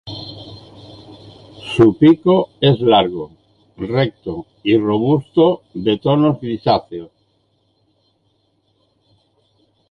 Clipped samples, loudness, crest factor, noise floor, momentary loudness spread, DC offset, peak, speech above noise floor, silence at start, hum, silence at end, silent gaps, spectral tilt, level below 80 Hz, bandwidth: under 0.1%; -15 LUFS; 16 dB; -63 dBFS; 21 LU; under 0.1%; -2 dBFS; 48 dB; 0.05 s; none; 2.85 s; none; -8.5 dB/octave; -50 dBFS; 9.6 kHz